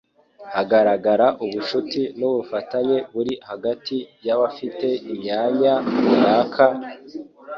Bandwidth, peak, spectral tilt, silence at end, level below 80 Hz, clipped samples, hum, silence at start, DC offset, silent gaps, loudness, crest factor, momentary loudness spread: 7 kHz; -2 dBFS; -7 dB/octave; 0 s; -64 dBFS; under 0.1%; none; 0.4 s; under 0.1%; none; -21 LUFS; 18 dB; 11 LU